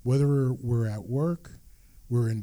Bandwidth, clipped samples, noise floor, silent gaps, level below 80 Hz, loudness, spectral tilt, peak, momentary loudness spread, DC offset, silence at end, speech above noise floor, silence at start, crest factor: 12.5 kHz; under 0.1%; -52 dBFS; none; -52 dBFS; -28 LUFS; -9 dB/octave; -14 dBFS; 7 LU; under 0.1%; 0 s; 26 dB; 0.05 s; 12 dB